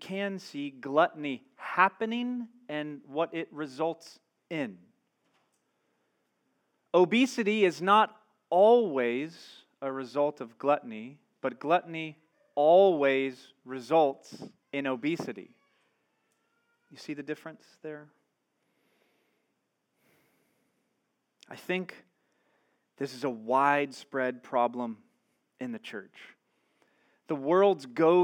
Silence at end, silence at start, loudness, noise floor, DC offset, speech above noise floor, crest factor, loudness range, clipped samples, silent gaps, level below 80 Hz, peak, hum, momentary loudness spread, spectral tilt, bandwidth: 0 s; 0 s; -29 LUFS; -79 dBFS; under 0.1%; 51 dB; 22 dB; 16 LU; under 0.1%; none; under -90 dBFS; -8 dBFS; none; 20 LU; -5.5 dB/octave; 15 kHz